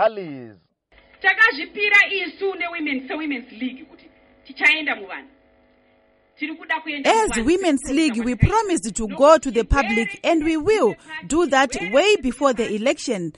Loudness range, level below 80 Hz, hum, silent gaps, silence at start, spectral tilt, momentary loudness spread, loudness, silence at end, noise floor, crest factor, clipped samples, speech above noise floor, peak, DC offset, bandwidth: 6 LU; -38 dBFS; none; none; 0 s; -4.5 dB/octave; 16 LU; -19 LUFS; 0.05 s; -59 dBFS; 20 dB; under 0.1%; 39 dB; -2 dBFS; under 0.1%; 11.5 kHz